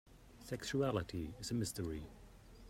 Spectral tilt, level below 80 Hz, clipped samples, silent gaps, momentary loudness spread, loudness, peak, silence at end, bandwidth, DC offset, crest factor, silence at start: -5.5 dB/octave; -58 dBFS; under 0.1%; none; 20 LU; -41 LUFS; -22 dBFS; 0 s; 16 kHz; under 0.1%; 20 dB; 0.05 s